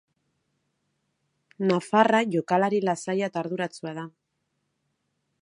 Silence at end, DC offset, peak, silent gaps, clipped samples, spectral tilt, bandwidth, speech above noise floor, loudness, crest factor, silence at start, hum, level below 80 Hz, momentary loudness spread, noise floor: 1.35 s; under 0.1%; -4 dBFS; none; under 0.1%; -5.5 dB/octave; 11 kHz; 53 dB; -25 LUFS; 24 dB; 1.6 s; none; -76 dBFS; 15 LU; -77 dBFS